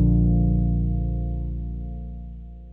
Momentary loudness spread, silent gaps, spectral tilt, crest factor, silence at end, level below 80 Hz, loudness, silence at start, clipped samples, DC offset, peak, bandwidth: 18 LU; none; -14 dB/octave; 12 dB; 0 s; -26 dBFS; -24 LUFS; 0 s; under 0.1%; under 0.1%; -10 dBFS; 1 kHz